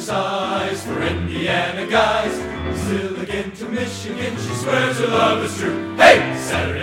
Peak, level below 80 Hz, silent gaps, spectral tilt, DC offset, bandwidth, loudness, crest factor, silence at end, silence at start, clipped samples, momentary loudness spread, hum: 0 dBFS; -42 dBFS; none; -4.5 dB/octave; under 0.1%; 16.5 kHz; -19 LUFS; 18 dB; 0 s; 0 s; under 0.1%; 12 LU; none